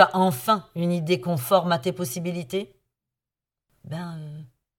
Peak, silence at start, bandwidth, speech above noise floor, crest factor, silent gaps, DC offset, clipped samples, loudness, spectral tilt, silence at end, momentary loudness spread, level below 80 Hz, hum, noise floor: -2 dBFS; 0 s; 18 kHz; 66 dB; 22 dB; none; under 0.1%; under 0.1%; -25 LUFS; -5.5 dB/octave; 0.3 s; 16 LU; -66 dBFS; none; -90 dBFS